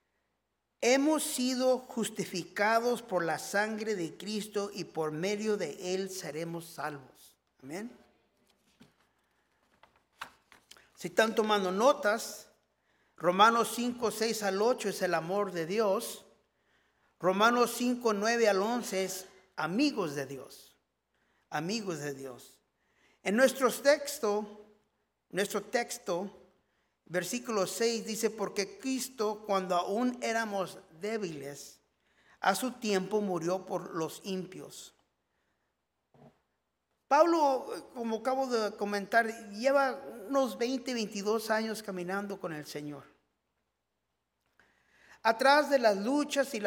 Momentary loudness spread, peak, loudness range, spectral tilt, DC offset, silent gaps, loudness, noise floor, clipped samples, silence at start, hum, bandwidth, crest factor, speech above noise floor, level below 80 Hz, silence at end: 15 LU; -8 dBFS; 10 LU; -3.5 dB/octave; under 0.1%; none; -31 LUFS; -84 dBFS; under 0.1%; 0.8 s; none; 18 kHz; 24 dB; 53 dB; -78 dBFS; 0 s